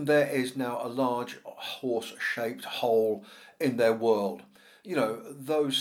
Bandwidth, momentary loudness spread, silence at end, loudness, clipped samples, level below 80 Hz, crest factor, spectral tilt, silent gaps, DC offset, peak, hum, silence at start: 17 kHz; 12 LU; 0 s; -29 LUFS; under 0.1%; -84 dBFS; 16 dB; -4.5 dB/octave; none; under 0.1%; -12 dBFS; none; 0 s